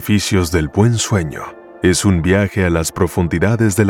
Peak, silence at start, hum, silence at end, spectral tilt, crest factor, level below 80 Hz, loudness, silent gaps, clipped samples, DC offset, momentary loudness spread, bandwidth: 0 dBFS; 0 s; none; 0 s; -5.5 dB/octave; 14 dB; -34 dBFS; -16 LUFS; none; under 0.1%; under 0.1%; 5 LU; 18 kHz